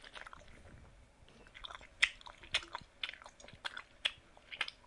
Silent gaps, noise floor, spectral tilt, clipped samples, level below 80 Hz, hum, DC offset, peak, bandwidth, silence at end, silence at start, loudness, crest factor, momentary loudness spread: none; -61 dBFS; -0.5 dB/octave; under 0.1%; -64 dBFS; none; under 0.1%; -10 dBFS; 11.5 kHz; 0 s; 0 s; -39 LUFS; 34 dB; 25 LU